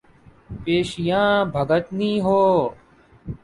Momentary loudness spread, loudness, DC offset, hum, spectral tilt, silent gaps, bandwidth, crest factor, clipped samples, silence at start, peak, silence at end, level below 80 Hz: 17 LU; -20 LUFS; under 0.1%; none; -6.5 dB/octave; none; 11.5 kHz; 16 dB; under 0.1%; 0.5 s; -6 dBFS; 0.1 s; -48 dBFS